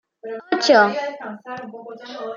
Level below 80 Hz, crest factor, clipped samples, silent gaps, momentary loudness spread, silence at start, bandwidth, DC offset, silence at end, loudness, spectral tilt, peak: -76 dBFS; 20 dB; under 0.1%; none; 21 LU; 0.25 s; 7.4 kHz; under 0.1%; 0 s; -17 LUFS; -3.5 dB/octave; -2 dBFS